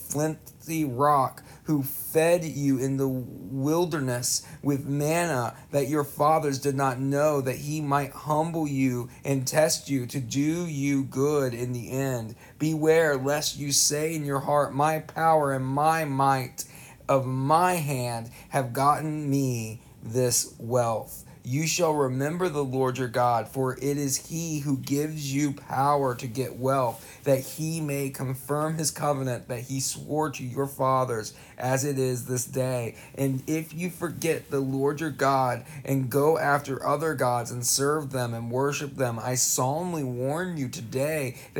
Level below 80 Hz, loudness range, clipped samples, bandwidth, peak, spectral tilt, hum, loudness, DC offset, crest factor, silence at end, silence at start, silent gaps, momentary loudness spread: -60 dBFS; 3 LU; under 0.1%; 19.5 kHz; -8 dBFS; -4.5 dB/octave; none; -26 LUFS; under 0.1%; 20 dB; 0 s; 0 s; none; 8 LU